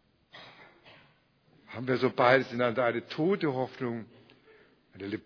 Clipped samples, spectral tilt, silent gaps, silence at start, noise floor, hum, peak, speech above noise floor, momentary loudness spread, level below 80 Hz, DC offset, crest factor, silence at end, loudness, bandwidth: under 0.1%; -4.5 dB/octave; none; 0.35 s; -65 dBFS; none; -6 dBFS; 37 dB; 22 LU; -76 dBFS; under 0.1%; 24 dB; 0.05 s; -29 LUFS; 5.4 kHz